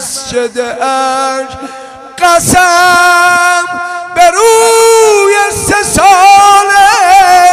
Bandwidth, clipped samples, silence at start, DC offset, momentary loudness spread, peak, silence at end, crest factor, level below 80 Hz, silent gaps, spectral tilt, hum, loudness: 16 kHz; 2%; 0 s; under 0.1%; 12 LU; 0 dBFS; 0 s; 6 dB; -36 dBFS; none; -2 dB/octave; none; -6 LUFS